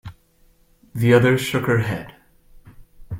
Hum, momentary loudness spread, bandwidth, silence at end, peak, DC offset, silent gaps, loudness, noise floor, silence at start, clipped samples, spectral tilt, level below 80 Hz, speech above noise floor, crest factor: none; 18 LU; 16.5 kHz; 0 s; 0 dBFS; under 0.1%; none; -19 LUFS; -57 dBFS; 0.05 s; under 0.1%; -6.5 dB/octave; -50 dBFS; 39 dB; 22 dB